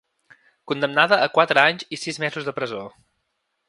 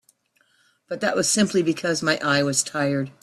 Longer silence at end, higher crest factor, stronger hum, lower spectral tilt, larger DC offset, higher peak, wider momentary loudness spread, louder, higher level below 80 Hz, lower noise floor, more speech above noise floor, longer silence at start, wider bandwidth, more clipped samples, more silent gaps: first, 0.8 s vs 0.1 s; about the same, 22 dB vs 18 dB; neither; about the same, -4 dB/octave vs -3.5 dB/octave; neither; first, 0 dBFS vs -6 dBFS; first, 13 LU vs 5 LU; about the same, -20 LUFS vs -22 LUFS; second, -72 dBFS vs -64 dBFS; first, -75 dBFS vs -65 dBFS; first, 54 dB vs 43 dB; second, 0.65 s vs 0.9 s; second, 11.5 kHz vs 14 kHz; neither; neither